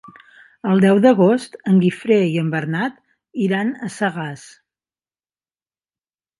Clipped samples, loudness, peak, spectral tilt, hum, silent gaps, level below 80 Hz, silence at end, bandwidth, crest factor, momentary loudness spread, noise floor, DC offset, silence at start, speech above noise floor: under 0.1%; -18 LUFS; 0 dBFS; -7.5 dB/octave; none; none; -66 dBFS; 2 s; 11.5 kHz; 18 dB; 15 LU; under -90 dBFS; under 0.1%; 0.65 s; over 73 dB